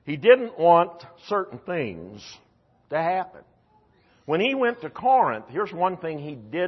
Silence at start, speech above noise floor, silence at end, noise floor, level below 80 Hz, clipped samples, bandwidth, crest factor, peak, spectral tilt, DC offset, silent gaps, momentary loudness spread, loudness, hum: 0.05 s; 38 dB; 0 s; -61 dBFS; -68 dBFS; under 0.1%; 6.2 kHz; 20 dB; -4 dBFS; -6.5 dB/octave; under 0.1%; none; 19 LU; -23 LUFS; none